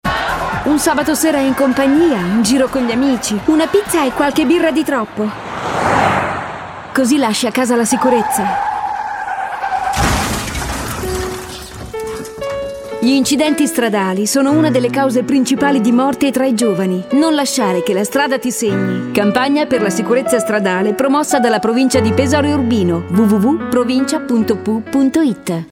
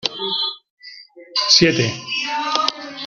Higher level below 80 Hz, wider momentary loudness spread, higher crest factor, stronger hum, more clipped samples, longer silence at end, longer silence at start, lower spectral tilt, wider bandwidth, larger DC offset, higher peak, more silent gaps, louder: first, -38 dBFS vs -56 dBFS; second, 8 LU vs 12 LU; second, 14 dB vs 20 dB; neither; neither; about the same, 0.05 s vs 0 s; about the same, 0.05 s vs 0.05 s; first, -4.5 dB/octave vs -3 dB/octave; first, 17.5 kHz vs 12 kHz; neither; about the same, 0 dBFS vs 0 dBFS; second, none vs 0.70-0.77 s; about the same, -15 LUFS vs -17 LUFS